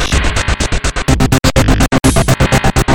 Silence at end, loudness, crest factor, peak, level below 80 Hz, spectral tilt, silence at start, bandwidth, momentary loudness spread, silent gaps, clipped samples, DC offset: 0 s; -12 LUFS; 10 dB; 0 dBFS; -16 dBFS; -4.5 dB/octave; 0 s; 19 kHz; 4 LU; none; under 0.1%; under 0.1%